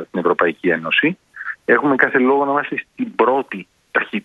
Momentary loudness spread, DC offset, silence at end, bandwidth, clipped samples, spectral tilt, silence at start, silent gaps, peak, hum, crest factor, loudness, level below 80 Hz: 12 LU; under 0.1%; 0.05 s; 5.2 kHz; under 0.1%; -7 dB/octave; 0 s; none; 0 dBFS; none; 18 dB; -17 LUFS; -64 dBFS